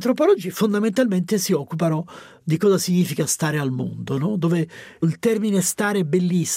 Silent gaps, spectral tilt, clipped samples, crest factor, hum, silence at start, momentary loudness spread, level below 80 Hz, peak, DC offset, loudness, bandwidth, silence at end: none; -5.5 dB/octave; under 0.1%; 14 dB; none; 0 s; 7 LU; -66 dBFS; -8 dBFS; under 0.1%; -21 LUFS; 16 kHz; 0 s